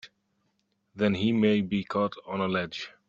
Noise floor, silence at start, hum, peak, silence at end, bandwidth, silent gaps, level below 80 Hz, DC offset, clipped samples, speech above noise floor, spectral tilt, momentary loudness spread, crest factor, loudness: -75 dBFS; 0.05 s; none; -10 dBFS; 0.2 s; 7.4 kHz; none; -64 dBFS; under 0.1%; under 0.1%; 47 dB; -7 dB/octave; 7 LU; 18 dB; -28 LUFS